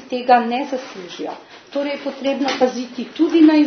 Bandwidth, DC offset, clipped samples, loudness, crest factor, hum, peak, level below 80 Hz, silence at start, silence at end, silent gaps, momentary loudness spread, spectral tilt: 6.6 kHz; under 0.1%; under 0.1%; -19 LUFS; 18 dB; none; 0 dBFS; -72 dBFS; 0 s; 0 s; none; 15 LU; -4 dB/octave